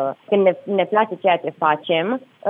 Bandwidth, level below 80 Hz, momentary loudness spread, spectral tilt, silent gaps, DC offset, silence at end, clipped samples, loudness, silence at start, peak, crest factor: 3.9 kHz; -80 dBFS; 3 LU; -8.5 dB/octave; none; under 0.1%; 0 s; under 0.1%; -19 LUFS; 0 s; -4 dBFS; 16 dB